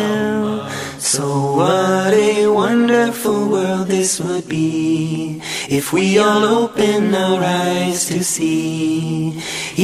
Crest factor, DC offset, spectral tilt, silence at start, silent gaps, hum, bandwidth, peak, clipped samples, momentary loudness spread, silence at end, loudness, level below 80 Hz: 14 dB; under 0.1%; -4.5 dB/octave; 0 s; none; none; 15.5 kHz; -2 dBFS; under 0.1%; 8 LU; 0 s; -16 LUFS; -56 dBFS